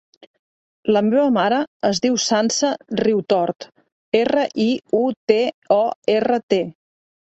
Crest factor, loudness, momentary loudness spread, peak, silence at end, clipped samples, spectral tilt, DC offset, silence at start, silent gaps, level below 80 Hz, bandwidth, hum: 18 dB; -19 LUFS; 5 LU; -2 dBFS; 0.7 s; under 0.1%; -4 dB/octave; under 0.1%; 0.85 s; 1.68-1.80 s, 3.92-4.12 s, 5.17-5.27 s, 5.54-5.62 s, 5.96-6.02 s, 6.43-6.49 s; -62 dBFS; 8.2 kHz; none